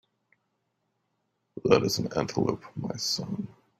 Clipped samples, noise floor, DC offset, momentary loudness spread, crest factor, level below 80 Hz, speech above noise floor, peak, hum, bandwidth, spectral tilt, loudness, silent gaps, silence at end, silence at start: under 0.1%; -78 dBFS; under 0.1%; 13 LU; 26 dB; -62 dBFS; 50 dB; -4 dBFS; none; 16 kHz; -4.5 dB/octave; -28 LUFS; none; 0.3 s; 1.55 s